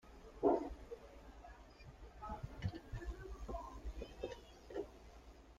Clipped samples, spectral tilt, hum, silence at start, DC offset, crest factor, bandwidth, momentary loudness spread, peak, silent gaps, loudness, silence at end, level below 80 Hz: under 0.1%; -7.5 dB/octave; none; 0.05 s; under 0.1%; 26 dB; 15 kHz; 22 LU; -20 dBFS; none; -45 LUFS; 0 s; -54 dBFS